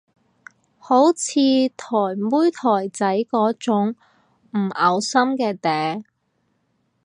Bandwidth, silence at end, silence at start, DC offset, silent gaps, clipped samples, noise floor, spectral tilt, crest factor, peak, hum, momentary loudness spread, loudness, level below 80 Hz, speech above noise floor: 11 kHz; 1 s; 0.85 s; under 0.1%; none; under 0.1%; -69 dBFS; -4.5 dB/octave; 18 dB; -2 dBFS; none; 8 LU; -20 LUFS; -74 dBFS; 50 dB